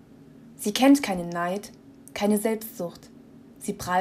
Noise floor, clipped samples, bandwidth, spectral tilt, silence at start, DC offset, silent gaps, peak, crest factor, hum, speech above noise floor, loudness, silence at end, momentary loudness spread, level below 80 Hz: -49 dBFS; under 0.1%; 16 kHz; -4.5 dB/octave; 0.45 s; under 0.1%; none; -8 dBFS; 18 dB; none; 25 dB; -25 LUFS; 0 s; 17 LU; -60 dBFS